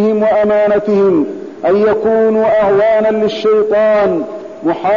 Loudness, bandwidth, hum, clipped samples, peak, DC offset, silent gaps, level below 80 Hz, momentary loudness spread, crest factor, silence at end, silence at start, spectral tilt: -12 LUFS; 7.2 kHz; none; under 0.1%; -4 dBFS; 0.3%; none; -48 dBFS; 8 LU; 8 dB; 0 s; 0 s; -7.5 dB/octave